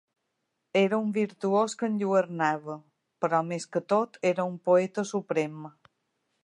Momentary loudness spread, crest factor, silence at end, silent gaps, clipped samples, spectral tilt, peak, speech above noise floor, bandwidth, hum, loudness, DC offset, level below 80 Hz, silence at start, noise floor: 10 LU; 18 dB; 0.75 s; none; under 0.1%; -6 dB/octave; -10 dBFS; 53 dB; 11.5 kHz; none; -28 LUFS; under 0.1%; -82 dBFS; 0.75 s; -80 dBFS